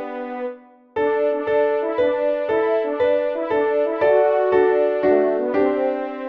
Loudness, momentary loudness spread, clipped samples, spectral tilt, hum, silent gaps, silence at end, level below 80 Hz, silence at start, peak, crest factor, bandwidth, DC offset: -19 LUFS; 8 LU; under 0.1%; -7.5 dB/octave; none; none; 0 s; -60 dBFS; 0 s; -6 dBFS; 14 dB; 5.2 kHz; under 0.1%